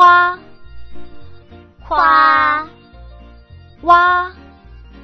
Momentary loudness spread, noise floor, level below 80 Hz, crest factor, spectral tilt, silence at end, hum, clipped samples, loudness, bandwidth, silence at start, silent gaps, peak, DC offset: 17 LU; -41 dBFS; -42 dBFS; 16 dB; -4.5 dB/octave; 0.75 s; none; under 0.1%; -12 LUFS; 6.4 kHz; 0 s; none; 0 dBFS; under 0.1%